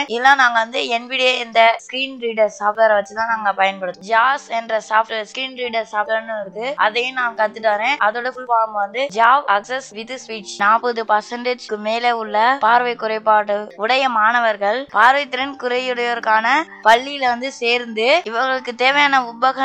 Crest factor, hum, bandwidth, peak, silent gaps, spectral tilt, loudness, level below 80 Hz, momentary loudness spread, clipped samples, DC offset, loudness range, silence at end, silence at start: 18 dB; none; 9.6 kHz; 0 dBFS; none; -2.5 dB/octave; -17 LUFS; -68 dBFS; 10 LU; under 0.1%; under 0.1%; 4 LU; 0 s; 0 s